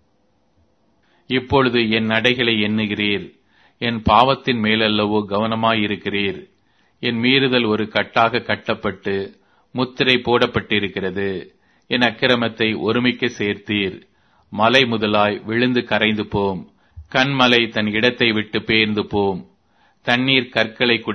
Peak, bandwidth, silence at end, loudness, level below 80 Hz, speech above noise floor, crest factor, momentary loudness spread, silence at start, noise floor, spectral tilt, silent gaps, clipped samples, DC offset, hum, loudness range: 0 dBFS; 6.6 kHz; 0 s; -18 LUFS; -48 dBFS; 45 dB; 20 dB; 10 LU; 1.3 s; -63 dBFS; -6 dB/octave; none; under 0.1%; under 0.1%; none; 2 LU